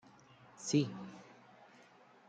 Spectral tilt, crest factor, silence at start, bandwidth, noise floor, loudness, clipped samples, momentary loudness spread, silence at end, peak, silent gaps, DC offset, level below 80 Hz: -5 dB/octave; 22 dB; 0.6 s; 9.4 kHz; -63 dBFS; -37 LUFS; under 0.1%; 26 LU; 0.95 s; -20 dBFS; none; under 0.1%; -82 dBFS